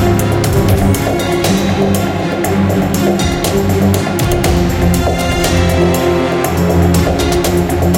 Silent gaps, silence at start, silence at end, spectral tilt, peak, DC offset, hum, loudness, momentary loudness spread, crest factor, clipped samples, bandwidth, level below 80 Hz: none; 0 s; 0 s; -5.5 dB/octave; 0 dBFS; under 0.1%; none; -13 LUFS; 2 LU; 12 dB; under 0.1%; 17.5 kHz; -24 dBFS